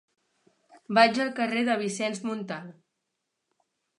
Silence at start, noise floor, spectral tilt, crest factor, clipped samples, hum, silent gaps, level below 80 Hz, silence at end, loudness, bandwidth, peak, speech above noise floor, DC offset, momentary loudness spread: 0.75 s; -82 dBFS; -4 dB/octave; 24 dB; under 0.1%; none; none; -82 dBFS; 1.25 s; -26 LUFS; 11 kHz; -4 dBFS; 56 dB; under 0.1%; 14 LU